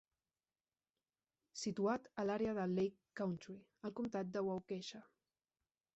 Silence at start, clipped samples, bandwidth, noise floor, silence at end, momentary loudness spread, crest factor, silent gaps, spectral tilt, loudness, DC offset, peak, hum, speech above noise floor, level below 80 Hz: 1.55 s; under 0.1%; 8 kHz; under -90 dBFS; 0.9 s; 12 LU; 18 dB; none; -6 dB/octave; -42 LUFS; under 0.1%; -26 dBFS; none; over 48 dB; -78 dBFS